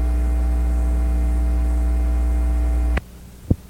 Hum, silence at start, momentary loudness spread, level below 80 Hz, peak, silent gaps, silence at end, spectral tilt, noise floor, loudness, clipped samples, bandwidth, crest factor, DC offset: 60 Hz at -20 dBFS; 0 s; 4 LU; -20 dBFS; -4 dBFS; none; 0.05 s; -8 dB/octave; -39 dBFS; -22 LUFS; under 0.1%; 10 kHz; 16 dB; under 0.1%